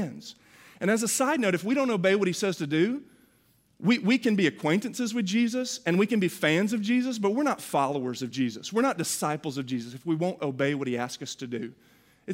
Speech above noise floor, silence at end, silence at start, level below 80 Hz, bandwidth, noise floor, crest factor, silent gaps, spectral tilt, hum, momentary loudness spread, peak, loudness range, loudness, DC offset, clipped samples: 38 dB; 0 s; 0 s; -74 dBFS; 16 kHz; -65 dBFS; 18 dB; none; -4.5 dB/octave; none; 10 LU; -10 dBFS; 4 LU; -27 LUFS; under 0.1%; under 0.1%